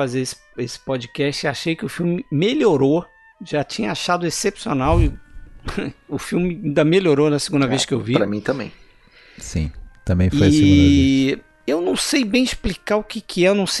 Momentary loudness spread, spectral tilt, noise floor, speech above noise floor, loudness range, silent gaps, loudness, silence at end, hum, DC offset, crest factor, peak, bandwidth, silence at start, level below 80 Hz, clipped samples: 13 LU; -5.5 dB/octave; -49 dBFS; 31 dB; 5 LU; none; -19 LUFS; 0 s; none; under 0.1%; 18 dB; 0 dBFS; 12 kHz; 0 s; -34 dBFS; under 0.1%